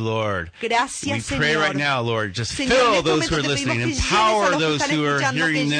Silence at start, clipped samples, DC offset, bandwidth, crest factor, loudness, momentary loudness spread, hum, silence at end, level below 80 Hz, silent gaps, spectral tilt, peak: 0 s; under 0.1%; under 0.1%; 10 kHz; 12 dB; -20 LUFS; 7 LU; none; 0 s; -42 dBFS; none; -4 dB/octave; -8 dBFS